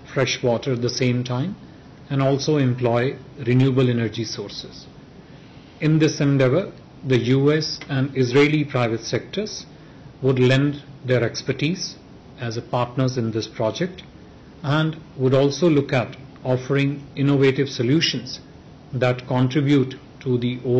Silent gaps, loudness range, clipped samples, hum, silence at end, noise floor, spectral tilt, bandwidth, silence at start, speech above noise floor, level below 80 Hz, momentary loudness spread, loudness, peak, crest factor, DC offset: none; 4 LU; under 0.1%; none; 0 s; -44 dBFS; -6.5 dB/octave; 7.8 kHz; 0 s; 23 dB; -54 dBFS; 13 LU; -21 LUFS; -6 dBFS; 14 dB; under 0.1%